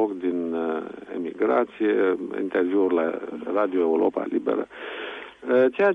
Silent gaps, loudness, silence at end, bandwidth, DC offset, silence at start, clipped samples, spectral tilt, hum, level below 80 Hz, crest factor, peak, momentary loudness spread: none; -25 LUFS; 0 s; 4.8 kHz; under 0.1%; 0 s; under 0.1%; -7.5 dB/octave; none; -70 dBFS; 16 dB; -8 dBFS; 12 LU